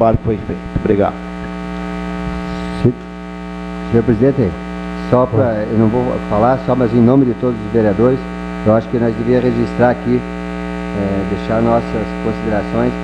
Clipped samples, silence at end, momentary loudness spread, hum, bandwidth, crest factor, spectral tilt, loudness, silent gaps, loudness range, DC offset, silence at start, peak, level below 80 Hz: under 0.1%; 0 s; 11 LU; 60 Hz at -25 dBFS; 9.4 kHz; 16 dB; -9 dB/octave; -16 LUFS; none; 6 LU; under 0.1%; 0 s; 0 dBFS; -32 dBFS